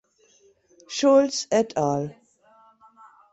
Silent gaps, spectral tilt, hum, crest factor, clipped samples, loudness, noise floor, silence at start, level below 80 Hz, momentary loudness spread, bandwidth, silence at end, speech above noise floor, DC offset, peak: none; -4.5 dB/octave; none; 18 dB; under 0.1%; -22 LUFS; -60 dBFS; 0.9 s; -68 dBFS; 13 LU; 8.2 kHz; 1.2 s; 38 dB; under 0.1%; -8 dBFS